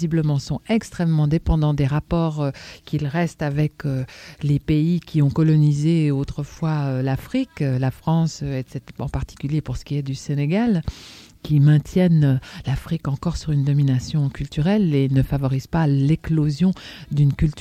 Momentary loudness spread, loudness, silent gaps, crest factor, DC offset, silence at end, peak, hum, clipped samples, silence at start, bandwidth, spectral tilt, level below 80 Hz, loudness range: 11 LU; -21 LUFS; none; 14 dB; under 0.1%; 0 s; -6 dBFS; none; under 0.1%; 0 s; 9.4 kHz; -8 dB/octave; -38 dBFS; 4 LU